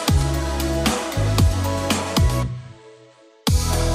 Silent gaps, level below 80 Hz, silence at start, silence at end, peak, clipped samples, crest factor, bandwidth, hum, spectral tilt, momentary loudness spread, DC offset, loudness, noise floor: none; -26 dBFS; 0 s; 0 s; -2 dBFS; under 0.1%; 18 dB; 16 kHz; none; -5 dB/octave; 7 LU; under 0.1%; -21 LUFS; -50 dBFS